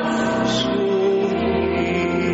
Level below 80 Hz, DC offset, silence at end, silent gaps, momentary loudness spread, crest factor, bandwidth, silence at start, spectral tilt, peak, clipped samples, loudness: -44 dBFS; under 0.1%; 0 s; none; 2 LU; 10 dB; 8 kHz; 0 s; -4 dB/octave; -8 dBFS; under 0.1%; -20 LUFS